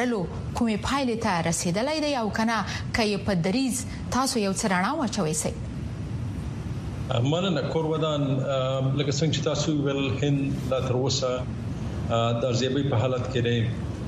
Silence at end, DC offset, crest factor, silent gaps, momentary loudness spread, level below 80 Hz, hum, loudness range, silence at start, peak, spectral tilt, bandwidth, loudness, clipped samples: 0 s; under 0.1%; 18 dB; none; 8 LU; -44 dBFS; none; 2 LU; 0 s; -8 dBFS; -5 dB/octave; 13.5 kHz; -26 LUFS; under 0.1%